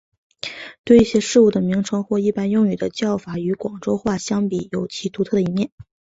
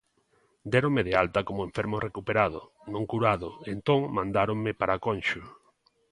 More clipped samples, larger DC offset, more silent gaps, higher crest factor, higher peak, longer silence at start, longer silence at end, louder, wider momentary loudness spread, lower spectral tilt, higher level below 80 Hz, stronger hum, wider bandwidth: neither; neither; first, 0.79-0.84 s, 5.72-5.78 s vs none; about the same, 18 dB vs 22 dB; first, -2 dBFS vs -6 dBFS; second, 0.45 s vs 0.65 s; second, 0.3 s vs 0.6 s; first, -20 LUFS vs -28 LUFS; first, 13 LU vs 10 LU; about the same, -6 dB/octave vs -7 dB/octave; about the same, -50 dBFS vs -54 dBFS; neither; second, 8 kHz vs 11 kHz